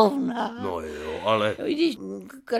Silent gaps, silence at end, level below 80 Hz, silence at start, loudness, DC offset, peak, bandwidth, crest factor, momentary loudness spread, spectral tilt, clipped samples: none; 0 s; -56 dBFS; 0 s; -26 LUFS; under 0.1%; -4 dBFS; 15 kHz; 20 dB; 11 LU; -5.5 dB/octave; under 0.1%